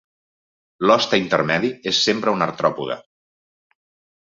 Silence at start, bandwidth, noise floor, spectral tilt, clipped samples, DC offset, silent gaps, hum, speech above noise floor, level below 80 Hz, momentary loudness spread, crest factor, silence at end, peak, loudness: 0.8 s; 7.8 kHz; under -90 dBFS; -4 dB/octave; under 0.1%; under 0.1%; none; none; over 71 dB; -62 dBFS; 9 LU; 20 dB; 1.25 s; -2 dBFS; -19 LUFS